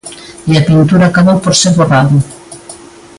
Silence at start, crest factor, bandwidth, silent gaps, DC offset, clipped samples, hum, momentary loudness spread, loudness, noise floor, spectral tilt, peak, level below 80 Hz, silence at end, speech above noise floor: 0.05 s; 10 dB; 11.5 kHz; none; under 0.1%; under 0.1%; none; 21 LU; -8 LUFS; -33 dBFS; -5.5 dB/octave; 0 dBFS; -40 dBFS; 0.4 s; 25 dB